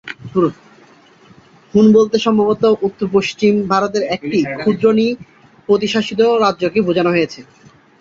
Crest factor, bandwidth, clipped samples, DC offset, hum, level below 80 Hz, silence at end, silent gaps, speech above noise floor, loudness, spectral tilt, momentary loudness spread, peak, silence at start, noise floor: 14 dB; 7.6 kHz; under 0.1%; under 0.1%; none; -54 dBFS; 0.6 s; none; 32 dB; -15 LUFS; -6 dB/octave; 7 LU; -2 dBFS; 0.05 s; -46 dBFS